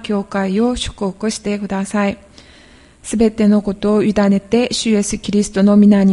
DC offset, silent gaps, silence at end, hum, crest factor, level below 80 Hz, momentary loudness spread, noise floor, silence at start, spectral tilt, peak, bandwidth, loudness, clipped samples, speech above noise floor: under 0.1%; none; 0 s; none; 14 dB; -40 dBFS; 9 LU; -45 dBFS; 0 s; -5.5 dB/octave; 0 dBFS; 11.5 kHz; -16 LUFS; under 0.1%; 30 dB